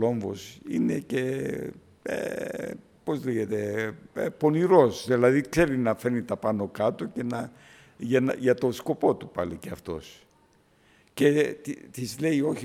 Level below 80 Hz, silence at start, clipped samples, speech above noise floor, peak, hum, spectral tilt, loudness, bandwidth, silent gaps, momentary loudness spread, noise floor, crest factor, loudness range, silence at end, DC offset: -58 dBFS; 0 s; under 0.1%; 36 dB; -6 dBFS; none; -6.5 dB/octave; -27 LUFS; 16 kHz; none; 15 LU; -62 dBFS; 22 dB; 7 LU; 0 s; under 0.1%